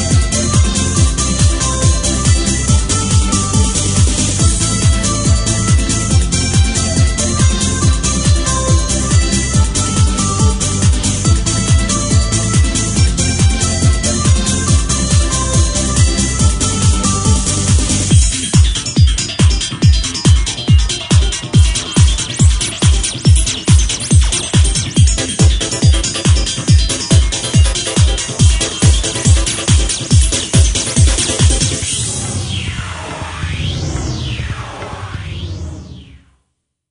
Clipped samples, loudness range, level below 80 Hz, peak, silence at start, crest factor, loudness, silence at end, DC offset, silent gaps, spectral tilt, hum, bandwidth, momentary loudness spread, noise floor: under 0.1%; 2 LU; -16 dBFS; 0 dBFS; 0 s; 12 dB; -13 LUFS; 0.85 s; under 0.1%; none; -4 dB/octave; none; 11 kHz; 7 LU; -68 dBFS